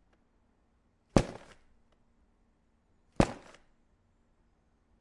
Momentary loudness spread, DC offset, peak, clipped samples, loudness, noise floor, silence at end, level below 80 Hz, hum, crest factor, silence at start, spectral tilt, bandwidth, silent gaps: 20 LU; under 0.1%; -4 dBFS; under 0.1%; -32 LUFS; -71 dBFS; 1.65 s; -48 dBFS; none; 34 dB; 1.15 s; -6.5 dB/octave; 11.5 kHz; none